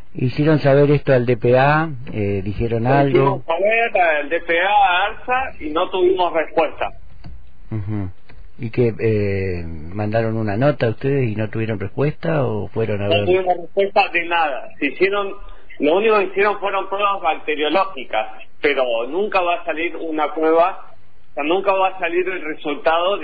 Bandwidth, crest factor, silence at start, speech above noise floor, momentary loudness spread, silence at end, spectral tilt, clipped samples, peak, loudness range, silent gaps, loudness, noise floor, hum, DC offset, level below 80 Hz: 5 kHz; 14 dB; 0.15 s; 21 dB; 11 LU; 0 s; -9.5 dB/octave; under 0.1%; -4 dBFS; 5 LU; none; -19 LUFS; -39 dBFS; none; 4%; -44 dBFS